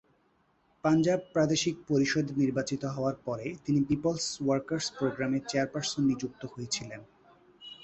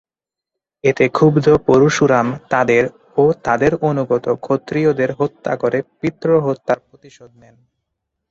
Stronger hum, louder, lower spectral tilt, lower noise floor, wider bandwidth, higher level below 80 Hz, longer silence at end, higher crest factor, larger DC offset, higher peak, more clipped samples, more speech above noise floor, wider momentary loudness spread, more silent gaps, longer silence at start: neither; second, -30 LUFS vs -16 LUFS; second, -5 dB/octave vs -6.5 dB/octave; second, -69 dBFS vs -87 dBFS; about the same, 8.4 kHz vs 7.8 kHz; second, -62 dBFS vs -50 dBFS; second, 0.05 s vs 1.05 s; about the same, 16 dB vs 16 dB; neither; second, -14 dBFS vs -2 dBFS; neither; second, 40 dB vs 71 dB; about the same, 9 LU vs 8 LU; neither; about the same, 0.85 s vs 0.85 s